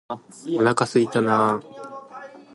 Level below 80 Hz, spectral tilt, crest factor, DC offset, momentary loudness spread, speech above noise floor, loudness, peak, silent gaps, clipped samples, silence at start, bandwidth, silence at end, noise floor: -66 dBFS; -5.5 dB/octave; 18 dB; under 0.1%; 19 LU; 20 dB; -21 LUFS; -4 dBFS; none; under 0.1%; 0.1 s; 11.5 kHz; 0.15 s; -41 dBFS